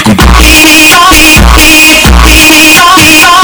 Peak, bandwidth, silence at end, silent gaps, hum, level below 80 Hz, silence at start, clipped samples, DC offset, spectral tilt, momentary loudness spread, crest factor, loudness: 0 dBFS; over 20 kHz; 0 s; none; none; -8 dBFS; 0 s; 80%; under 0.1%; -2.5 dB/octave; 3 LU; 0 dB; 1 LUFS